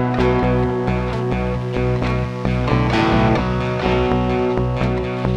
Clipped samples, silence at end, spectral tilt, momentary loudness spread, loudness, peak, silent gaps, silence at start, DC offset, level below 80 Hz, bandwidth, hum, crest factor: under 0.1%; 0 s; -8 dB/octave; 5 LU; -19 LUFS; -4 dBFS; none; 0 s; under 0.1%; -28 dBFS; 8.4 kHz; none; 14 dB